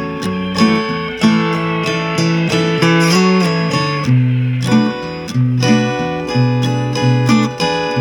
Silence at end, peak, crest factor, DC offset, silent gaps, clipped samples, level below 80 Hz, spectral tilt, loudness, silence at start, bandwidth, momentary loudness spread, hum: 0 s; 0 dBFS; 14 dB; under 0.1%; none; under 0.1%; -46 dBFS; -6 dB/octave; -14 LUFS; 0 s; 17 kHz; 6 LU; none